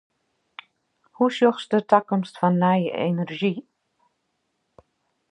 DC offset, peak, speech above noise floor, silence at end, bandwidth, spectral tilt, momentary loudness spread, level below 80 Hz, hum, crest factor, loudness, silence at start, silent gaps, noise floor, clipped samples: under 0.1%; -2 dBFS; 53 dB; 1.7 s; 9.6 kHz; -7.5 dB/octave; 7 LU; -72 dBFS; none; 22 dB; -22 LUFS; 1.2 s; none; -74 dBFS; under 0.1%